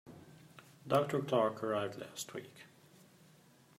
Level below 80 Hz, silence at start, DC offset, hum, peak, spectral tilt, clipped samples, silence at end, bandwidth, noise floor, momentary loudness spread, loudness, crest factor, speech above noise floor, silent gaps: -80 dBFS; 0.05 s; under 0.1%; none; -18 dBFS; -5.5 dB/octave; under 0.1%; 1.15 s; 16 kHz; -64 dBFS; 25 LU; -36 LUFS; 22 dB; 29 dB; none